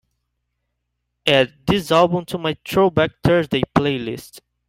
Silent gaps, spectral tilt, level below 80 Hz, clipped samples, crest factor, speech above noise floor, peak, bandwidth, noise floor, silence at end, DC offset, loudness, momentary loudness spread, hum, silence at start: none; -6 dB/octave; -46 dBFS; under 0.1%; 18 dB; 57 dB; -2 dBFS; 16 kHz; -75 dBFS; 0.3 s; under 0.1%; -18 LUFS; 8 LU; 60 Hz at -50 dBFS; 1.25 s